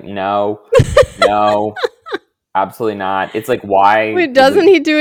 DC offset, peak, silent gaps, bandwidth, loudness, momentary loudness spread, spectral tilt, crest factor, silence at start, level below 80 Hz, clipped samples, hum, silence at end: under 0.1%; 0 dBFS; none; 18 kHz; -13 LUFS; 11 LU; -5.5 dB/octave; 12 dB; 0.05 s; -38 dBFS; 0.5%; none; 0 s